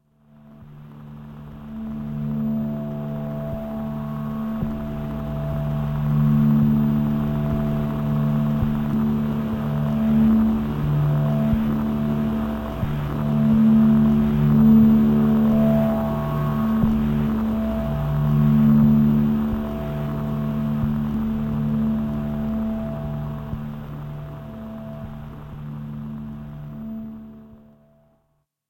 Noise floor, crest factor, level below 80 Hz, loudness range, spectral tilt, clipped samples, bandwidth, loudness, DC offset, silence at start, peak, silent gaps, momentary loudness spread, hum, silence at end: -70 dBFS; 16 dB; -36 dBFS; 15 LU; -10 dB/octave; under 0.1%; 16 kHz; -21 LUFS; under 0.1%; 0.45 s; -6 dBFS; none; 18 LU; none; 1.15 s